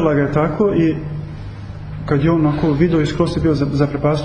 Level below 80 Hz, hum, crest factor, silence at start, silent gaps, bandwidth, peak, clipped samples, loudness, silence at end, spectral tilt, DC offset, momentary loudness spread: -34 dBFS; none; 14 dB; 0 s; none; 9.6 kHz; -2 dBFS; under 0.1%; -17 LUFS; 0 s; -8.5 dB/octave; under 0.1%; 15 LU